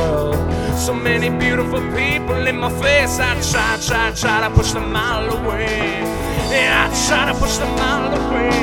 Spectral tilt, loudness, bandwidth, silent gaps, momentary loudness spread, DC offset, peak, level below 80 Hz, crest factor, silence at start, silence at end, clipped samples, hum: -4 dB/octave; -17 LUFS; over 20 kHz; none; 5 LU; under 0.1%; 0 dBFS; -28 dBFS; 18 dB; 0 s; 0 s; under 0.1%; none